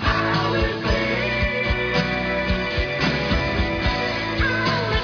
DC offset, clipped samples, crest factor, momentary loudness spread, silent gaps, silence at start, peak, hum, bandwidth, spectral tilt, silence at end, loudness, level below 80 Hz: under 0.1%; under 0.1%; 16 dB; 2 LU; none; 0 s; -6 dBFS; none; 5.4 kHz; -6 dB/octave; 0 s; -21 LUFS; -30 dBFS